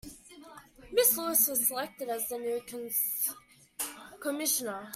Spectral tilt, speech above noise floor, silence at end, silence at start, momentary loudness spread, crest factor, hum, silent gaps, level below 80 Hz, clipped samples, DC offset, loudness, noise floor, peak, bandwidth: -1 dB/octave; 21 dB; 0 s; 0.05 s; 13 LU; 22 dB; none; none; -66 dBFS; under 0.1%; under 0.1%; -29 LUFS; -52 dBFS; -12 dBFS; 16 kHz